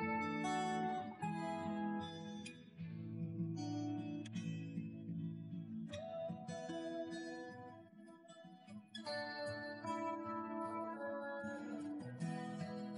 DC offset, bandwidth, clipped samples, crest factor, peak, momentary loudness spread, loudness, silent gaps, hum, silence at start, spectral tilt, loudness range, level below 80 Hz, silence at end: under 0.1%; 10.5 kHz; under 0.1%; 16 dB; -30 dBFS; 13 LU; -45 LUFS; none; none; 0 s; -6 dB/octave; 5 LU; -82 dBFS; 0 s